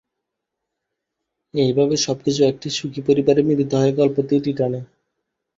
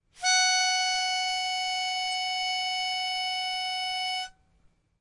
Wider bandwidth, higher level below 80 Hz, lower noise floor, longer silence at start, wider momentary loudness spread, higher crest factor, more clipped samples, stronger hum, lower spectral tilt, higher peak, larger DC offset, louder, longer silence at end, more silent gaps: second, 7.8 kHz vs 11.5 kHz; first, -58 dBFS vs -68 dBFS; first, -81 dBFS vs -65 dBFS; first, 1.55 s vs 0.15 s; about the same, 8 LU vs 7 LU; about the same, 18 dB vs 16 dB; neither; neither; first, -6 dB/octave vs 4 dB/octave; first, -2 dBFS vs -12 dBFS; neither; first, -19 LUFS vs -26 LUFS; about the same, 0.7 s vs 0.7 s; neither